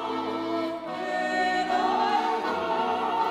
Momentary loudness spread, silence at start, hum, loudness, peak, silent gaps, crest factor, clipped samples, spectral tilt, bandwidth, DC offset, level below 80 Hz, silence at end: 6 LU; 0 s; none; -27 LUFS; -12 dBFS; none; 14 dB; under 0.1%; -4 dB/octave; 14 kHz; under 0.1%; -64 dBFS; 0 s